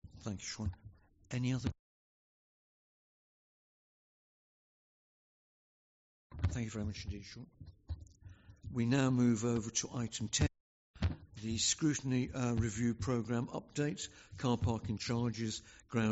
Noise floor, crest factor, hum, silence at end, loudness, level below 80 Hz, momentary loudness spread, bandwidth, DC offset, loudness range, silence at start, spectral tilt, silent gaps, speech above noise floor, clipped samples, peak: -59 dBFS; 20 dB; none; 0 s; -37 LUFS; -54 dBFS; 16 LU; 8 kHz; under 0.1%; 10 LU; 0.05 s; -6 dB/octave; 1.79-6.30 s, 10.60-10.94 s; 23 dB; under 0.1%; -20 dBFS